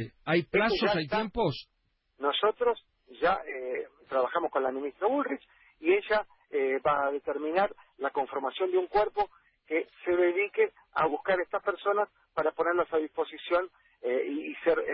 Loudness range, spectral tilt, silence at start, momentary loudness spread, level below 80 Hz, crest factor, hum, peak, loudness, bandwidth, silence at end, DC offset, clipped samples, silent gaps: 2 LU; -9 dB/octave; 0 s; 8 LU; -62 dBFS; 16 dB; none; -14 dBFS; -30 LUFS; 5.8 kHz; 0 s; under 0.1%; under 0.1%; none